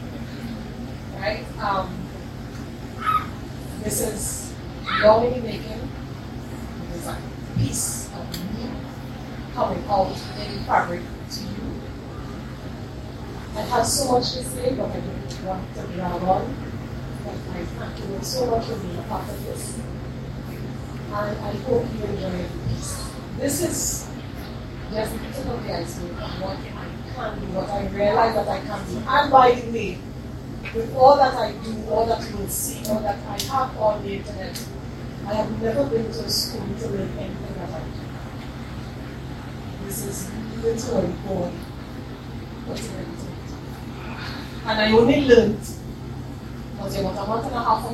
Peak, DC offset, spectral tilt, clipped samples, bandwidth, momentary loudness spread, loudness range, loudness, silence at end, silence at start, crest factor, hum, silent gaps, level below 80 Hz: 0 dBFS; under 0.1%; -4.5 dB/octave; under 0.1%; 16 kHz; 15 LU; 8 LU; -25 LUFS; 0 s; 0 s; 24 dB; none; none; -40 dBFS